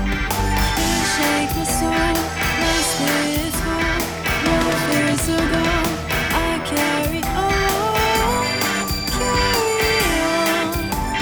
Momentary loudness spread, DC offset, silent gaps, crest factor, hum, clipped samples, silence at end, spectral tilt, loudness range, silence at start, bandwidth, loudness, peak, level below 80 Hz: 4 LU; under 0.1%; none; 14 dB; none; under 0.1%; 0 s; -3.5 dB/octave; 1 LU; 0 s; over 20 kHz; -19 LUFS; -6 dBFS; -30 dBFS